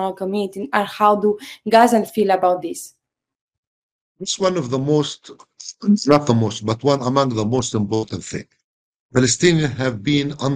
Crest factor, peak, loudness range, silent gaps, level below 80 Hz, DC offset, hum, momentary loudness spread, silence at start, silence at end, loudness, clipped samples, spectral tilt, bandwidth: 18 dB; 0 dBFS; 4 LU; 3.41-3.48 s, 3.58-4.15 s, 8.64-9.09 s; -54 dBFS; under 0.1%; none; 14 LU; 0 s; 0 s; -18 LUFS; under 0.1%; -5 dB/octave; 15.5 kHz